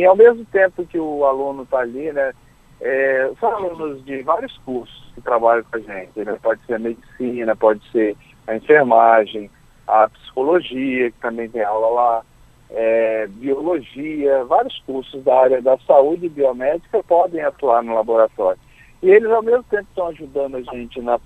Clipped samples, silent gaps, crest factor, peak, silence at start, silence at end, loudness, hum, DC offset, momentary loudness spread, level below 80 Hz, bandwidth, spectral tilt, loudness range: under 0.1%; none; 18 dB; 0 dBFS; 0 s; 0.05 s; -18 LUFS; none; under 0.1%; 14 LU; -52 dBFS; 8.4 kHz; -7 dB/octave; 5 LU